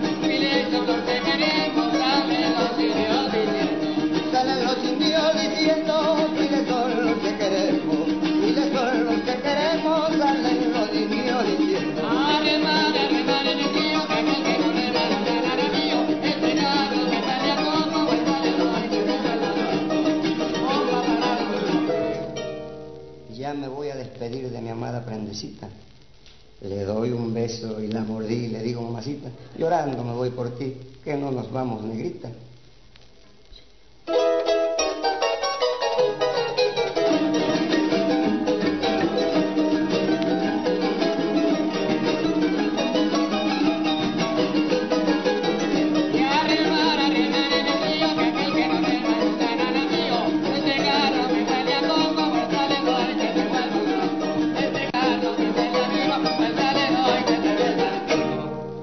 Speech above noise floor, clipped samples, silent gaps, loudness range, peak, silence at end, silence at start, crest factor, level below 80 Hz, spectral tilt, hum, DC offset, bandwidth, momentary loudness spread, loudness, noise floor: 25 dB; under 0.1%; none; 8 LU; -8 dBFS; 0 s; 0 s; 14 dB; -56 dBFS; -5 dB/octave; none; 0.3%; 6.4 kHz; 10 LU; -22 LUFS; -53 dBFS